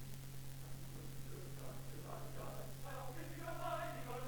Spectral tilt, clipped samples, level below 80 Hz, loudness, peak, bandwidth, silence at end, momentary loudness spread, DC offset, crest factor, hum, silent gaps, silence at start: -5 dB/octave; under 0.1%; -58 dBFS; -49 LUFS; -30 dBFS; 19.5 kHz; 0 s; 8 LU; 0.2%; 16 dB; none; none; 0 s